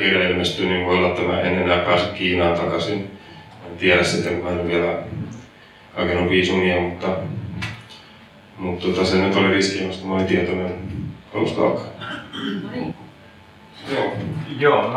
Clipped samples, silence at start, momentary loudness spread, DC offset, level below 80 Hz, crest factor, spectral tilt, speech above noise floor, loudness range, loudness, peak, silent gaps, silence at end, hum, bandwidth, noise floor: under 0.1%; 0 s; 15 LU; under 0.1%; -50 dBFS; 18 dB; -5.5 dB/octave; 26 dB; 6 LU; -21 LUFS; -2 dBFS; none; 0 s; none; 12 kHz; -46 dBFS